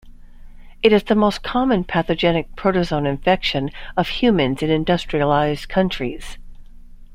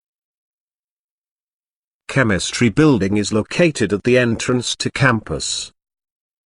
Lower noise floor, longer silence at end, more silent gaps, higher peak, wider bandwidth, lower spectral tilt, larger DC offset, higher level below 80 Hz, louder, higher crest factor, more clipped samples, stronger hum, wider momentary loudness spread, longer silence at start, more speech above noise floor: second, -38 dBFS vs under -90 dBFS; second, 0 s vs 0.8 s; neither; about the same, -2 dBFS vs 0 dBFS; first, 15.5 kHz vs 11.5 kHz; first, -6.5 dB/octave vs -5 dB/octave; neither; first, -36 dBFS vs -46 dBFS; about the same, -19 LUFS vs -17 LUFS; about the same, 18 dB vs 20 dB; neither; neither; about the same, 7 LU vs 7 LU; second, 0.05 s vs 2.1 s; second, 20 dB vs over 73 dB